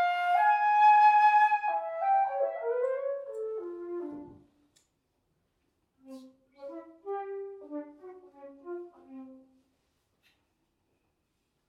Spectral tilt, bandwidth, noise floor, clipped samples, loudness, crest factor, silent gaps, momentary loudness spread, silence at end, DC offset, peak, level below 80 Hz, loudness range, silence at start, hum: -3.5 dB/octave; 6.2 kHz; -78 dBFS; under 0.1%; -26 LUFS; 16 dB; none; 26 LU; 2.35 s; under 0.1%; -14 dBFS; -80 dBFS; 24 LU; 0 s; none